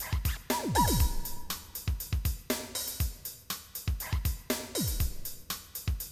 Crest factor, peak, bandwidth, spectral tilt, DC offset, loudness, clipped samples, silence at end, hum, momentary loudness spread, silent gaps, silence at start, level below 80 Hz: 18 dB; -14 dBFS; 19 kHz; -4 dB/octave; under 0.1%; -33 LUFS; under 0.1%; 0 s; none; 11 LU; none; 0 s; -36 dBFS